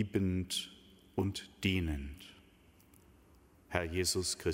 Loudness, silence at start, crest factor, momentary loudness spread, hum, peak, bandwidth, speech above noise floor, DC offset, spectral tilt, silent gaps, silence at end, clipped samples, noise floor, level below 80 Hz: -36 LUFS; 0 s; 24 dB; 16 LU; none; -14 dBFS; 16 kHz; 28 dB; under 0.1%; -4 dB/octave; none; 0 s; under 0.1%; -63 dBFS; -52 dBFS